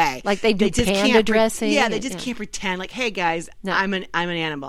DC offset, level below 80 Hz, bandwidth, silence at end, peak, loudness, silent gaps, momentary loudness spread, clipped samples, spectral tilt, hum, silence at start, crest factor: under 0.1%; -40 dBFS; 15.5 kHz; 0 s; -2 dBFS; -21 LUFS; none; 10 LU; under 0.1%; -4 dB/octave; none; 0 s; 18 dB